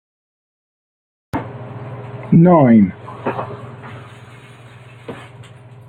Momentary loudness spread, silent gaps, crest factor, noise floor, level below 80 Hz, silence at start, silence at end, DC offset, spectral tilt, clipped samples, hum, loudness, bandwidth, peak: 25 LU; none; 16 dB; -40 dBFS; -52 dBFS; 1.35 s; 0.7 s; under 0.1%; -10.5 dB/octave; under 0.1%; none; -14 LUFS; 4.3 kHz; -2 dBFS